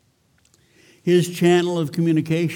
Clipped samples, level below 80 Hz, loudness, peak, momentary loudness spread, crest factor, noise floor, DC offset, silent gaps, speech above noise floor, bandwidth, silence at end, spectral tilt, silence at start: under 0.1%; -66 dBFS; -19 LUFS; -6 dBFS; 5 LU; 14 dB; -61 dBFS; under 0.1%; none; 43 dB; 17.5 kHz; 0 s; -6.5 dB/octave; 1.05 s